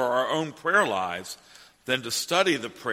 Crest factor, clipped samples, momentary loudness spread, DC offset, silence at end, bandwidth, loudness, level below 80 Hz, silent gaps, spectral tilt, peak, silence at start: 20 dB; under 0.1%; 16 LU; under 0.1%; 0 s; 16 kHz; -25 LUFS; -70 dBFS; none; -3 dB/octave; -6 dBFS; 0 s